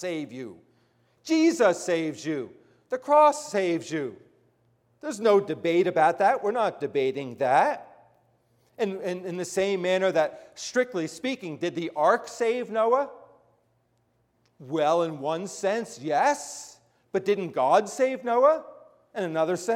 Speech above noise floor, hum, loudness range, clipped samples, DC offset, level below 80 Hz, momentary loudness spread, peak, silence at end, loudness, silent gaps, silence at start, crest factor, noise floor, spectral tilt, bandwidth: 45 dB; none; 4 LU; under 0.1%; under 0.1%; -76 dBFS; 13 LU; -8 dBFS; 0 s; -25 LUFS; none; 0 s; 18 dB; -70 dBFS; -4.5 dB/octave; 15.5 kHz